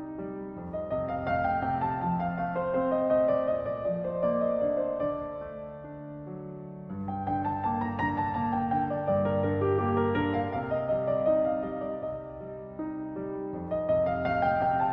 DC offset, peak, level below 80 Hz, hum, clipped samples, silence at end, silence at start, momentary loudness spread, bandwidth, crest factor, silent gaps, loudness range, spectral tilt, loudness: under 0.1%; -14 dBFS; -54 dBFS; none; under 0.1%; 0 s; 0 s; 14 LU; 5.4 kHz; 14 dB; none; 5 LU; -10 dB/octave; -29 LUFS